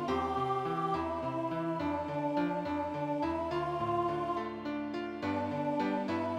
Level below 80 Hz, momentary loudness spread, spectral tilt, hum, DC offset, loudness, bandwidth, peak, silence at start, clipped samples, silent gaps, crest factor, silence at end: -60 dBFS; 4 LU; -7.5 dB/octave; none; under 0.1%; -34 LUFS; 10.5 kHz; -20 dBFS; 0 s; under 0.1%; none; 12 dB; 0 s